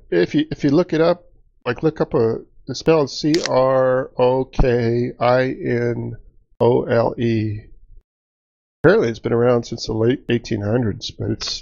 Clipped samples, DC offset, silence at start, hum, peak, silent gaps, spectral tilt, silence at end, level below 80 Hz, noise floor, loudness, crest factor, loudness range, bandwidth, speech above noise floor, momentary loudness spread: under 0.1%; under 0.1%; 0.1 s; none; 0 dBFS; 8.04-8.84 s; -5.5 dB/octave; 0 s; -36 dBFS; under -90 dBFS; -19 LUFS; 18 dB; 2 LU; 7.8 kHz; over 72 dB; 9 LU